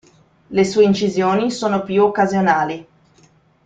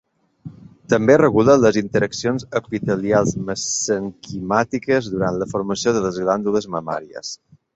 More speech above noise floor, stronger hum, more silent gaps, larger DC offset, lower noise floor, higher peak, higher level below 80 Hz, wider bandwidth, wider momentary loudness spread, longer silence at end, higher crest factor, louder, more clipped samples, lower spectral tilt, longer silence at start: first, 37 dB vs 22 dB; neither; neither; neither; first, -54 dBFS vs -40 dBFS; about the same, -2 dBFS vs -2 dBFS; second, -56 dBFS vs -50 dBFS; first, 9.2 kHz vs 8.2 kHz; second, 7 LU vs 15 LU; first, 0.85 s vs 0.4 s; about the same, 16 dB vs 18 dB; about the same, -17 LUFS vs -19 LUFS; neither; about the same, -6 dB/octave vs -5 dB/octave; about the same, 0.5 s vs 0.45 s